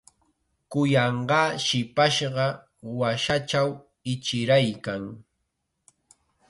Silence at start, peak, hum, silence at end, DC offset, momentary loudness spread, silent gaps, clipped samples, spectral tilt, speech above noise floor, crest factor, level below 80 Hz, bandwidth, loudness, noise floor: 0.7 s; -8 dBFS; none; 1.3 s; under 0.1%; 12 LU; none; under 0.1%; -5 dB/octave; 54 dB; 18 dB; -60 dBFS; 11.5 kHz; -24 LUFS; -78 dBFS